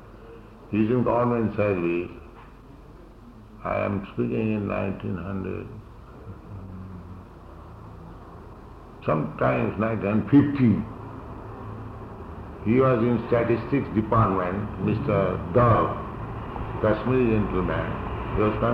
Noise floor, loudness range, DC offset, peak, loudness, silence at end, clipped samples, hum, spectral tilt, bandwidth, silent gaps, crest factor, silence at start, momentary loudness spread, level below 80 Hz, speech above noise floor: -46 dBFS; 11 LU; under 0.1%; -8 dBFS; -24 LUFS; 0 s; under 0.1%; none; -10 dB/octave; 5.4 kHz; none; 18 dB; 0 s; 23 LU; -42 dBFS; 23 dB